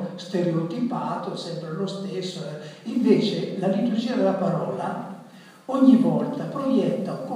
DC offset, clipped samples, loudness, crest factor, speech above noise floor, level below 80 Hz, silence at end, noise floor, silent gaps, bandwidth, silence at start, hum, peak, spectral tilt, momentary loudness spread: under 0.1%; under 0.1%; -24 LUFS; 20 dB; 23 dB; -80 dBFS; 0 s; -46 dBFS; none; 11 kHz; 0 s; none; -4 dBFS; -7.5 dB/octave; 13 LU